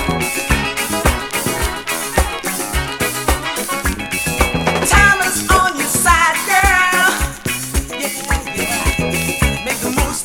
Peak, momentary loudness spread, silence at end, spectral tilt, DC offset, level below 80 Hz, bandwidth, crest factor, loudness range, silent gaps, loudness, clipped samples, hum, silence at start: 0 dBFS; 8 LU; 0 s; -3 dB/octave; under 0.1%; -24 dBFS; over 20 kHz; 16 dB; 6 LU; none; -15 LUFS; under 0.1%; none; 0 s